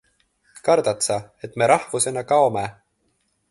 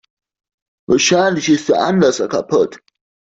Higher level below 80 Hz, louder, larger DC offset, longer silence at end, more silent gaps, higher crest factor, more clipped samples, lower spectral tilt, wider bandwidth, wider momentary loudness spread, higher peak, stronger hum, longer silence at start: about the same, -60 dBFS vs -56 dBFS; second, -20 LUFS vs -15 LUFS; neither; first, 0.8 s vs 0.6 s; neither; first, 20 dB vs 14 dB; neither; about the same, -3.5 dB/octave vs -4 dB/octave; first, 12 kHz vs 8 kHz; first, 10 LU vs 5 LU; about the same, -2 dBFS vs -2 dBFS; neither; second, 0.65 s vs 0.9 s